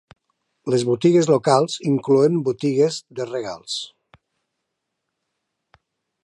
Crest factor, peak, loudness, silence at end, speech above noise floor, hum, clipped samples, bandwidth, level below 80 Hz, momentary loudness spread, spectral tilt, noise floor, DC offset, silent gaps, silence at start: 20 dB; -2 dBFS; -20 LUFS; 2.4 s; 60 dB; none; under 0.1%; 11.5 kHz; -68 dBFS; 12 LU; -6 dB/octave; -79 dBFS; under 0.1%; none; 0.65 s